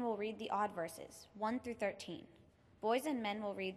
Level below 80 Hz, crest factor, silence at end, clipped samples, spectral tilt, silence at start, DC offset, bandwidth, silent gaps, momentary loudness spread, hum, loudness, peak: -76 dBFS; 18 dB; 0 s; under 0.1%; -4.5 dB/octave; 0 s; under 0.1%; 14.5 kHz; none; 12 LU; none; -41 LUFS; -24 dBFS